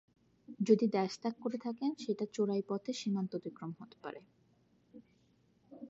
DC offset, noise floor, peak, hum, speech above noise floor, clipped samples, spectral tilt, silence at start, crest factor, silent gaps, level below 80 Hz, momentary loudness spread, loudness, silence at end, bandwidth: under 0.1%; -71 dBFS; -14 dBFS; none; 36 dB; under 0.1%; -6.5 dB/octave; 0.5 s; 22 dB; none; -84 dBFS; 18 LU; -36 LUFS; 0 s; 7.6 kHz